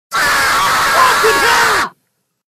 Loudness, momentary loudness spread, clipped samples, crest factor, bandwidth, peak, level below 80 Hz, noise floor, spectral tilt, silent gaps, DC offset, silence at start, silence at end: -11 LUFS; 4 LU; under 0.1%; 14 dB; 15.5 kHz; 0 dBFS; -42 dBFS; -66 dBFS; -0.5 dB/octave; none; under 0.1%; 0.1 s; 0.65 s